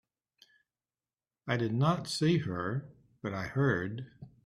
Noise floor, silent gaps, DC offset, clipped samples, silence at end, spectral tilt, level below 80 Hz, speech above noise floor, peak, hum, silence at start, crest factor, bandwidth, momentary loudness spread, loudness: under -90 dBFS; none; under 0.1%; under 0.1%; 0.15 s; -6.5 dB/octave; -66 dBFS; over 59 dB; -14 dBFS; none; 1.45 s; 18 dB; 13.5 kHz; 14 LU; -32 LUFS